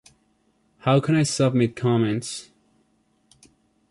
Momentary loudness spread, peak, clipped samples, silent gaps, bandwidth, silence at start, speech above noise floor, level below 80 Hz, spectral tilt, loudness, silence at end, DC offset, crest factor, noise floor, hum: 10 LU; -6 dBFS; under 0.1%; none; 11.5 kHz; 0.85 s; 45 dB; -60 dBFS; -6 dB/octave; -22 LUFS; 1.5 s; under 0.1%; 18 dB; -66 dBFS; none